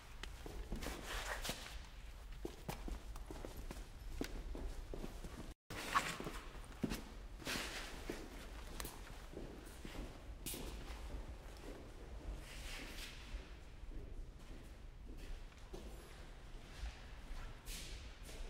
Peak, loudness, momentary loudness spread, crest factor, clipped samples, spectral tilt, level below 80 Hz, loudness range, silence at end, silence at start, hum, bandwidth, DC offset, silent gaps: -20 dBFS; -49 LUFS; 12 LU; 28 dB; under 0.1%; -3.5 dB/octave; -52 dBFS; 10 LU; 0 s; 0 s; none; 16 kHz; under 0.1%; 5.55-5.70 s